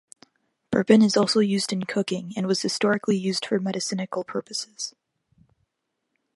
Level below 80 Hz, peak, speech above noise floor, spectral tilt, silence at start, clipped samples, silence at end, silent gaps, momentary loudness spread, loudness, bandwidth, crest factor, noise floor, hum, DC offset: -66 dBFS; -4 dBFS; 56 dB; -4.5 dB/octave; 0.7 s; under 0.1%; 1.45 s; none; 12 LU; -24 LUFS; 11.5 kHz; 22 dB; -79 dBFS; none; under 0.1%